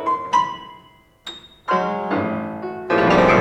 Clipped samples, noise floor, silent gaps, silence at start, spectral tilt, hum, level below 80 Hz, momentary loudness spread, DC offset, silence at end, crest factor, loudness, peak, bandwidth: under 0.1%; -50 dBFS; none; 0 s; -6 dB/octave; none; -46 dBFS; 20 LU; under 0.1%; 0 s; 16 dB; -20 LUFS; -4 dBFS; 10 kHz